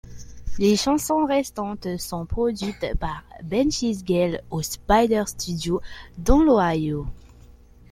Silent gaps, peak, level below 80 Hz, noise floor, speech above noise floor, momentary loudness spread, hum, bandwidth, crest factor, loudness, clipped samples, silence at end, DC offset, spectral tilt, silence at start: none; -2 dBFS; -34 dBFS; -48 dBFS; 26 dB; 12 LU; none; 16.5 kHz; 20 dB; -23 LUFS; under 0.1%; 0.4 s; under 0.1%; -5 dB/octave; 0.05 s